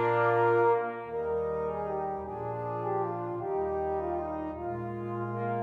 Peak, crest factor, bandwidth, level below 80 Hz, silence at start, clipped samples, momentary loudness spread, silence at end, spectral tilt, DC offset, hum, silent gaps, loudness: -16 dBFS; 14 dB; 4.9 kHz; -56 dBFS; 0 s; under 0.1%; 11 LU; 0 s; -9.5 dB/octave; under 0.1%; none; none; -31 LUFS